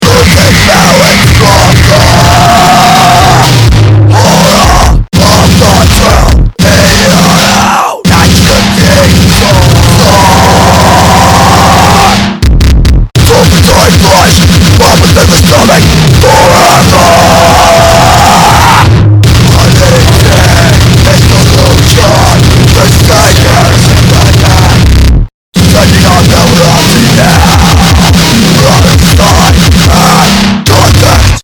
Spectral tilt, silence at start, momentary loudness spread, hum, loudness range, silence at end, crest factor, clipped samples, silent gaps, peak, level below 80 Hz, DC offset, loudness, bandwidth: -4.5 dB/octave; 0 s; 3 LU; none; 2 LU; 0 s; 2 dB; 20%; 25.34-25.52 s; 0 dBFS; -12 dBFS; under 0.1%; -3 LUFS; over 20 kHz